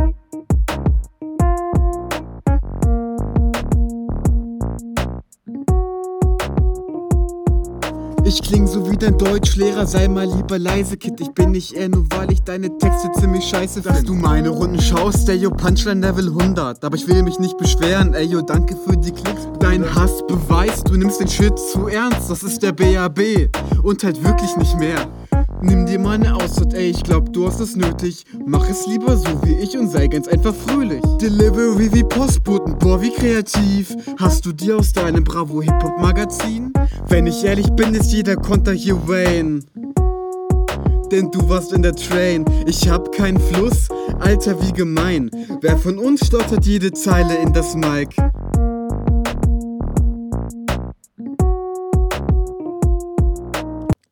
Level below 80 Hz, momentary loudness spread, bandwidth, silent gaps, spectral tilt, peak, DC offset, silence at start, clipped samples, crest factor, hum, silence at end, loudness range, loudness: -20 dBFS; 7 LU; 19 kHz; none; -6 dB/octave; 0 dBFS; under 0.1%; 0 s; under 0.1%; 16 dB; none; 0.2 s; 4 LU; -17 LUFS